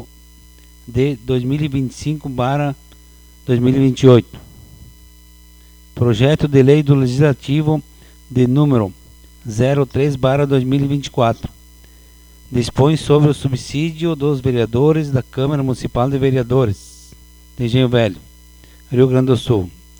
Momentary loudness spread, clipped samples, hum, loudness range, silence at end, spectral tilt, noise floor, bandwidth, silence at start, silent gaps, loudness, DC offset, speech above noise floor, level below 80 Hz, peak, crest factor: 11 LU; under 0.1%; none; 3 LU; 0.3 s; -7.5 dB/octave; -43 dBFS; over 20 kHz; 0 s; none; -16 LUFS; under 0.1%; 29 dB; -40 dBFS; 0 dBFS; 16 dB